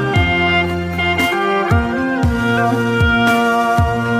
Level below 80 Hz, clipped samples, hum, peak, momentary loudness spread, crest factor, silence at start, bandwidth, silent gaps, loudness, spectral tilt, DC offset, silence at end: -28 dBFS; under 0.1%; none; -2 dBFS; 4 LU; 12 dB; 0 s; 15.5 kHz; none; -15 LUFS; -6 dB/octave; under 0.1%; 0 s